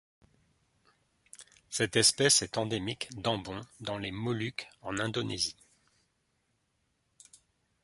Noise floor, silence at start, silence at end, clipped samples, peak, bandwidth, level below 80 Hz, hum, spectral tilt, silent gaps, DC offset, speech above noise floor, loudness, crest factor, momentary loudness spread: -77 dBFS; 1.4 s; 2.3 s; under 0.1%; -10 dBFS; 12 kHz; -64 dBFS; none; -2.5 dB/octave; none; under 0.1%; 45 dB; -30 LUFS; 26 dB; 16 LU